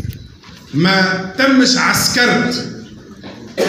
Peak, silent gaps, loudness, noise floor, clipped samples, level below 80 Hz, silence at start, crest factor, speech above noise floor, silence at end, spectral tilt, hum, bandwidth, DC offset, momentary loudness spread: 0 dBFS; none; -13 LUFS; -38 dBFS; under 0.1%; -46 dBFS; 0 s; 16 dB; 25 dB; 0 s; -3.5 dB/octave; none; 16 kHz; under 0.1%; 22 LU